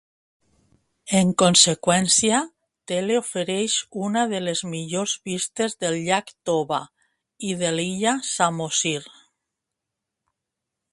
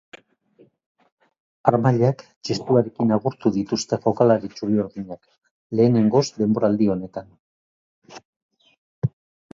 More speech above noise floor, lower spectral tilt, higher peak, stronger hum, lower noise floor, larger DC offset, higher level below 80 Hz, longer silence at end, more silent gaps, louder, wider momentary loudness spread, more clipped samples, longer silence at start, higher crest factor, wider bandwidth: first, 61 dB vs 37 dB; second, -3 dB/octave vs -7 dB/octave; about the same, -2 dBFS vs 0 dBFS; neither; first, -84 dBFS vs -57 dBFS; neither; about the same, -62 dBFS vs -58 dBFS; first, 1.85 s vs 0.45 s; second, none vs 0.86-0.95 s, 1.12-1.18 s, 1.40-1.64 s, 2.36-2.41 s, 5.51-5.70 s, 7.39-8.02 s, 8.25-8.49 s, 8.78-9.02 s; about the same, -22 LUFS vs -21 LUFS; about the same, 11 LU vs 12 LU; neither; first, 1.05 s vs 0.15 s; about the same, 22 dB vs 22 dB; first, 11.5 kHz vs 7.8 kHz